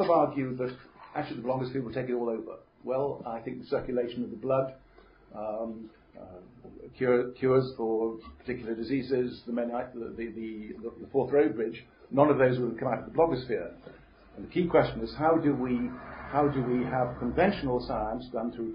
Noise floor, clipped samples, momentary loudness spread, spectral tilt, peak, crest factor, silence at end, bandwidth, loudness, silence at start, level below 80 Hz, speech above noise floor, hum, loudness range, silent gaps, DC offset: -56 dBFS; under 0.1%; 16 LU; -11 dB/octave; -8 dBFS; 22 dB; 0 s; 5.4 kHz; -30 LUFS; 0 s; -54 dBFS; 27 dB; none; 6 LU; none; under 0.1%